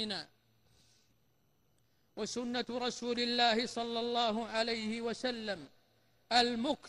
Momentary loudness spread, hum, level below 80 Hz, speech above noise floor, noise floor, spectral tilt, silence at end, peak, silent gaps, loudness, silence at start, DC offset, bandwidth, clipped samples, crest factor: 12 LU; none; -70 dBFS; 40 dB; -75 dBFS; -3 dB/octave; 0 s; -16 dBFS; none; -34 LUFS; 0 s; under 0.1%; 12 kHz; under 0.1%; 20 dB